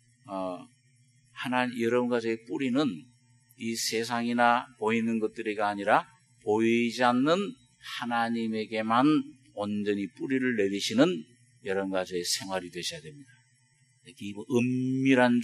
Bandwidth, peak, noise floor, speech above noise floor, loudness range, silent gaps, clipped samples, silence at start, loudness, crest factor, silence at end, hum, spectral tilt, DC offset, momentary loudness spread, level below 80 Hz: 13 kHz; -8 dBFS; -66 dBFS; 38 dB; 4 LU; none; under 0.1%; 0.25 s; -28 LUFS; 22 dB; 0 s; none; -4.5 dB/octave; under 0.1%; 14 LU; -76 dBFS